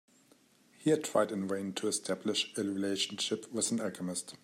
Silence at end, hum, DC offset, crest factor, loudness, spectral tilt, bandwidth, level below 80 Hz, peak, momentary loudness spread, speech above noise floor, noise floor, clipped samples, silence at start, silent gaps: 0.05 s; none; under 0.1%; 20 dB; -33 LUFS; -3.5 dB/octave; 16 kHz; -82 dBFS; -16 dBFS; 5 LU; 32 dB; -65 dBFS; under 0.1%; 0.8 s; none